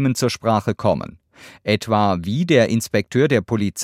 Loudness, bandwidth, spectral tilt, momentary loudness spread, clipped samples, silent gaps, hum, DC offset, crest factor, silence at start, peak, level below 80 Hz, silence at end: -19 LUFS; 16 kHz; -5.5 dB/octave; 6 LU; under 0.1%; none; none; under 0.1%; 18 dB; 0 s; -2 dBFS; -54 dBFS; 0 s